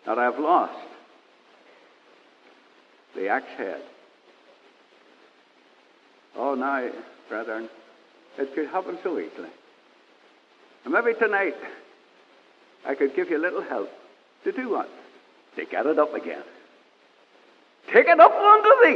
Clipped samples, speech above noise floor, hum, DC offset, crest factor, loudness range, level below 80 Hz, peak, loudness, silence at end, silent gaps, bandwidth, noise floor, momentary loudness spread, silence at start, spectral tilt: under 0.1%; 37 dB; none; under 0.1%; 24 dB; 9 LU; under -90 dBFS; -2 dBFS; -22 LUFS; 0 s; none; 6.6 kHz; -58 dBFS; 26 LU; 0.05 s; -5.5 dB/octave